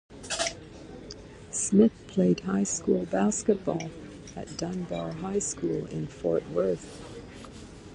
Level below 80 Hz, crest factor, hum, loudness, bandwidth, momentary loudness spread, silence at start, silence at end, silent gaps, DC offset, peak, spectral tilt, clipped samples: -54 dBFS; 22 dB; none; -28 LUFS; 11.5 kHz; 20 LU; 0.1 s; 0 s; none; under 0.1%; -8 dBFS; -5 dB/octave; under 0.1%